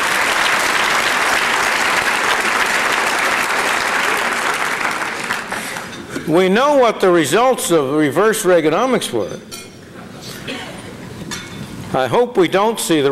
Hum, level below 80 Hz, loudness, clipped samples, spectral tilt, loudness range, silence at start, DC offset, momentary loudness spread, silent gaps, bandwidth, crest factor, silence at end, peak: none; -50 dBFS; -15 LUFS; under 0.1%; -3 dB/octave; 7 LU; 0 s; under 0.1%; 17 LU; none; 16 kHz; 12 dB; 0 s; -4 dBFS